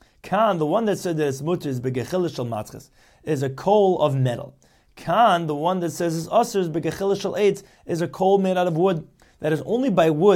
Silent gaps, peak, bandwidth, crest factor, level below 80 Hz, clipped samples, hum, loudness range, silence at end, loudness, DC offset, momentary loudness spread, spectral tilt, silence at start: none; -4 dBFS; 16.5 kHz; 18 dB; -58 dBFS; under 0.1%; none; 3 LU; 0 s; -22 LUFS; under 0.1%; 11 LU; -6.5 dB/octave; 0.25 s